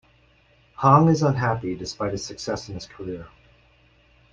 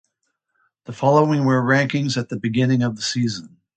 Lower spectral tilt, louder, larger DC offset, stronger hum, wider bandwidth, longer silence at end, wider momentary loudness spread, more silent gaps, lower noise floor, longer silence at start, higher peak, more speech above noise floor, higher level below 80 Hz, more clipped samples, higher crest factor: about the same, -6.5 dB/octave vs -6 dB/octave; second, -22 LUFS vs -19 LUFS; neither; neither; second, 7.8 kHz vs 9 kHz; first, 1.05 s vs 0.3 s; first, 18 LU vs 8 LU; neither; second, -59 dBFS vs -74 dBFS; about the same, 0.8 s vs 0.9 s; about the same, -4 dBFS vs -2 dBFS; second, 36 dB vs 55 dB; first, -52 dBFS vs -60 dBFS; neither; about the same, 22 dB vs 18 dB